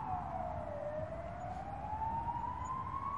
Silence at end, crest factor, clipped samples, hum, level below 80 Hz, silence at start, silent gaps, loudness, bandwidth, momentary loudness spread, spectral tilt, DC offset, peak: 0 s; 14 dB; under 0.1%; none; -54 dBFS; 0 s; none; -41 LUFS; 11 kHz; 5 LU; -7.5 dB/octave; 0.1%; -26 dBFS